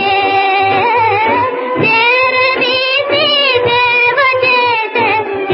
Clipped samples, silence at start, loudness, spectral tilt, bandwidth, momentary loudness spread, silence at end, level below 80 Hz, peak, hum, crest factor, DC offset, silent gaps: under 0.1%; 0 s; -10 LUFS; -8 dB/octave; 5.8 kHz; 4 LU; 0 s; -50 dBFS; 0 dBFS; none; 12 dB; under 0.1%; none